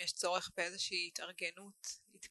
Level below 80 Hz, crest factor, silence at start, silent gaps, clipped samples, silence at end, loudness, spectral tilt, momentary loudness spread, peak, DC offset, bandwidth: -80 dBFS; 22 dB; 0 s; none; under 0.1%; 0.05 s; -40 LUFS; -0.5 dB/octave; 11 LU; -20 dBFS; under 0.1%; 12 kHz